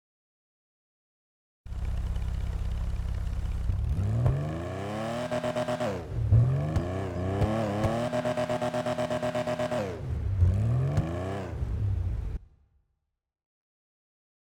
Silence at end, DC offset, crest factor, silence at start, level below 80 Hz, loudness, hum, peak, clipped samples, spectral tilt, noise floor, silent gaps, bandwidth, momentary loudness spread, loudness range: 2.1 s; under 0.1%; 18 dB; 1.65 s; -38 dBFS; -30 LUFS; none; -12 dBFS; under 0.1%; -7.5 dB/octave; -79 dBFS; none; 16 kHz; 8 LU; 8 LU